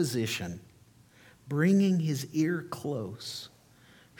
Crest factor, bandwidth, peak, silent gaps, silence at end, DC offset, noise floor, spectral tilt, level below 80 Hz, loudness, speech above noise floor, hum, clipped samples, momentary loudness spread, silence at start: 16 dB; 18.5 kHz; -14 dBFS; none; 0.75 s; under 0.1%; -59 dBFS; -6 dB/octave; -68 dBFS; -30 LUFS; 30 dB; none; under 0.1%; 16 LU; 0 s